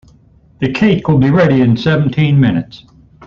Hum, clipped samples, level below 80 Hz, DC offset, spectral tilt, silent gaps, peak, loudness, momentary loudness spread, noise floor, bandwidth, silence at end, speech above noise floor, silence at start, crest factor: none; under 0.1%; -40 dBFS; under 0.1%; -8.5 dB/octave; none; -2 dBFS; -12 LUFS; 10 LU; -46 dBFS; 7 kHz; 0.5 s; 35 dB; 0.6 s; 12 dB